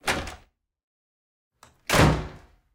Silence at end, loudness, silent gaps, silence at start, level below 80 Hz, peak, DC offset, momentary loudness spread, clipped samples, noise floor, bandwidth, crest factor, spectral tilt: 0.35 s; -23 LUFS; 0.83-1.51 s; 0.05 s; -38 dBFS; -4 dBFS; under 0.1%; 20 LU; under 0.1%; -55 dBFS; 17.5 kHz; 24 dB; -4.5 dB/octave